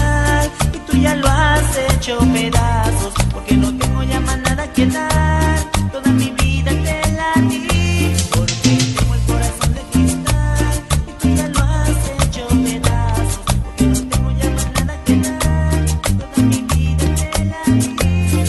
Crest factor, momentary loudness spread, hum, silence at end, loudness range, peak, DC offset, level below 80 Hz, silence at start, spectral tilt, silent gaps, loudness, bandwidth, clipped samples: 16 dB; 4 LU; none; 0 s; 2 LU; 0 dBFS; under 0.1%; -20 dBFS; 0 s; -5 dB/octave; none; -16 LUFS; 12.5 kHz; under 0.1%